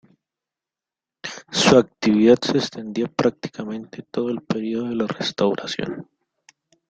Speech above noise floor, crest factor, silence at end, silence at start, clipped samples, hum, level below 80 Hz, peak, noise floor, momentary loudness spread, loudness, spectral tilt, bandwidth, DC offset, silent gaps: 68 dB; 20 dB; 0.85 s; 1.25 s; under 0.1%; none; -58 dBFS; -2 dBFS; -89 dBFS; 17 LU; -21 LUFS; -5 dB/octave; 9.2 kHz; under 0.1%; none